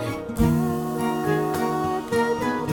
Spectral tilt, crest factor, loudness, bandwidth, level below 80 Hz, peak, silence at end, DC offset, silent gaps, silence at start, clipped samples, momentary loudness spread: -6.5 dB/octave; 16 dB; -24 LUFS; 19 kHz; -40 dBFS; -8 dBFS; 0 s; under 0.1%; none; 0 s; under 0.1%; 4 LU